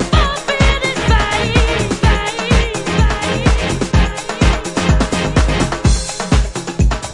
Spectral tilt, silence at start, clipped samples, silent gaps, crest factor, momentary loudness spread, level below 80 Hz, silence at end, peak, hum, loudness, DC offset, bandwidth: -5 dB/octave; 0 s; under 0.1%; none; 14 dB; 3 LU; -18 dBFS; 0 s; 0 dBFS; none; -15 LUFS; under 0.1%; 11.5 kHz